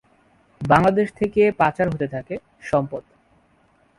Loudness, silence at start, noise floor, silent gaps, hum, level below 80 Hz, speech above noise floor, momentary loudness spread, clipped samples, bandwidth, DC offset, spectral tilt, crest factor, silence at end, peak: -20 LUFS; 0.6 s; -60 dBFS; none; none; -50 dBFS; 40 dB; 16 LU; under 0.1%; 11.5 kHz; under 0.1%; -7.5 dB/octave; 22 dB; 1 s; 0 dBFS